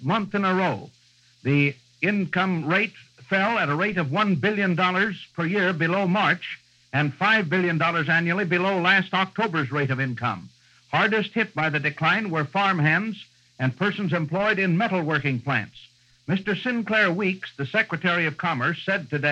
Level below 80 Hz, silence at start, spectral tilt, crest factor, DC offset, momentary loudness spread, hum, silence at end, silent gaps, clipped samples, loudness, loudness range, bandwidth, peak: -66 dBFS; 0 s; -7 dB/octave; 18 dB; under 0.1%; 7 LU; none; 0 s; none; under 0.1%; -23 LUFS; 3 LU; 8.4 kHz; -6 dBFS